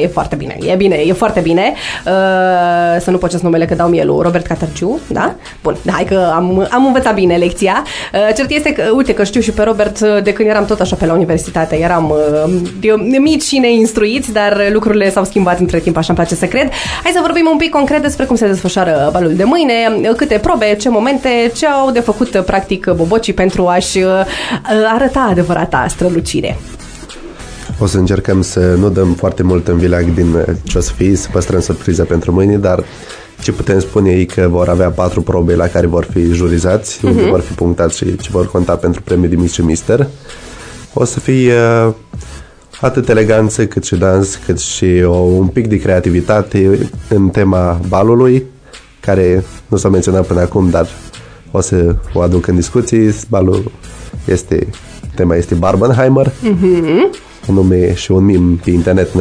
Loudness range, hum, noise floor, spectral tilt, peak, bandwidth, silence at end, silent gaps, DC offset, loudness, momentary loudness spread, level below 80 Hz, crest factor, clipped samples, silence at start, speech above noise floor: 3 LU; none; -37 dBFS; -6 dB/octave; 0 dBFS; 11 kHz; 0 s; none; under 0.1%; -12 LUFS; 7 LU; -28 dBFS; 12 dB; under 0.1%; 0 s; 26 dB